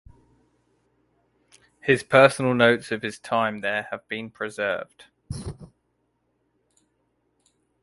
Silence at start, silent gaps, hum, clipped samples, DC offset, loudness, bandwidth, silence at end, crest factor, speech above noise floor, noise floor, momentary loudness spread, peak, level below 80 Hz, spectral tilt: 1.85 s; none; none; under 0.1%; under 0.1%; -23 LUFS; 11.5 kHz; 2.15 s; 24 dB; 50 dB; -72 dBFS; 20 LU; -2 dBFS; -54 dBFS; -5 dB/octave